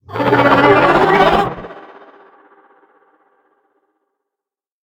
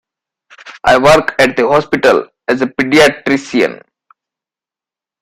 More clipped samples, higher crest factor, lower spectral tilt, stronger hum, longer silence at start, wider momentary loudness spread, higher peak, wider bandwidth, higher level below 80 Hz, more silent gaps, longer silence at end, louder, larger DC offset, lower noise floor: neither; about the same, 16 dB vs 14 dB; first, -6.5 dB/octave vs -4.5 dB/octave; neither; second, 0.1 s vs 0.65 s; first, 16 LU vs 8 LU; about the same, 0 dBFS vs 0 dBFS; about the same, 17.5 kHz vs 16 kHz; about the same, -44 dBFS vs -44 dBFS; neither; first, 3 s vs 1.45 s; about the same, -11 LUFS vs -11 LUFS; neither; about the same, -86 dBFS vs -89 dBFS